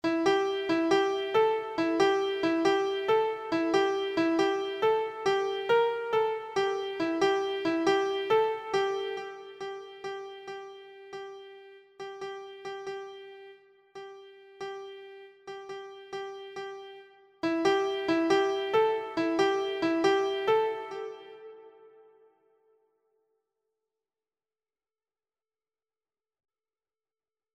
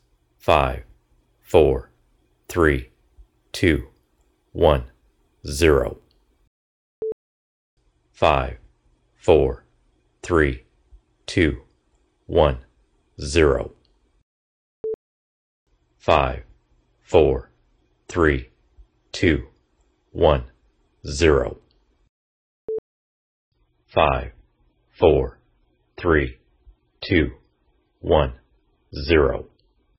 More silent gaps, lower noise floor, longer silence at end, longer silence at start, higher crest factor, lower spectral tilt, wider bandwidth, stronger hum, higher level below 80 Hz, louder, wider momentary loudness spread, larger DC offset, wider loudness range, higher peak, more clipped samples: second, none vs 6.47-7.02 s, 7.12-7.77 s, 14.23-14.84 s, 14.94-15.66 s, 22.09-22.68 s, 22.78-23.52 s; first, under -90 dBFS vs -65 dBFS; first, 5.7 s vs 0.55 s; second, 0.05 s vs 0.45 s; second, 18 dB vs 24 dB; second, -4.5 dB/octave vs -6 dB/octave; second, 9.8 kHz vs 17.5 kHz; neither; second, -72 dBFS vs -36 dBFS; second, -28 LUFS vs -21 LUFS; about the same, 19 LU vs 18 LU; neither; first, 16 LU vs 4 LU; second, -12 dBFS vs 0 dBFS; neither